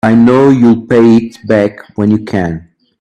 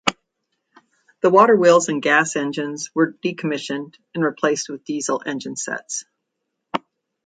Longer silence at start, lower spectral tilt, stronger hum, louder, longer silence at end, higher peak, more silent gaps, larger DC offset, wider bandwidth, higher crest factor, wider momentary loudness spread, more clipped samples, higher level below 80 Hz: about the same, 0.05 s vs 0.05 s; first, -8.5 dB/octave vs -4 dB/octave; neither; first, -10 LUFS vs -20 LUFS; about the same, 0.4 s vs 0.5 s; about the same, 0 dBFS vs 0 dBFS; neither; neither; about the same, 9 kHz vs 9.6 kHz; second, 10 dB vs 20 dB; second, 10 LU vs 16 LU; neither; first, -46 dBFS vs -66 dBFS